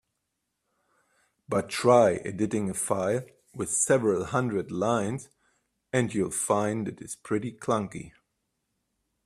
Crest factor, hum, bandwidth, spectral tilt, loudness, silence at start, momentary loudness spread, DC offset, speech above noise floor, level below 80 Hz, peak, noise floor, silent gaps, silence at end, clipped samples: 22 dB; none; 15 kHz; -5 dB/octave; -27 LUFS; 1.5 s; 13 LU; under 0.1%; 54 dB; -64 dBFS; -6 dBFS; -81 dBFS; none; 1.15 s; under 0.1%